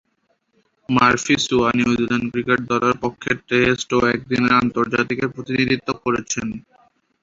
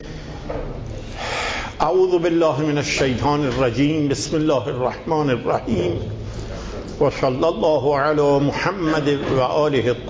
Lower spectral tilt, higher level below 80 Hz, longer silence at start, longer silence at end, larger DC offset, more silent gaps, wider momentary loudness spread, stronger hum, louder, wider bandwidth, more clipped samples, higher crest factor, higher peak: second, -4.5 dB/octave vs -6 dB/octave; second, -48 dBFS vs -38 dBFS; first, 0.9 s vs 0 s; first, 0.6 s vs 0 s; neither; neither; second, 8 LU vs 13 LU; neither; about the same, -19 LUFS vs -20 LUFS; about the same, 7.8 kHz vs 8 kHz; neither; about the same, 18 dB vs 16 dB; about the same, -2 dBFS vs -4 dBFS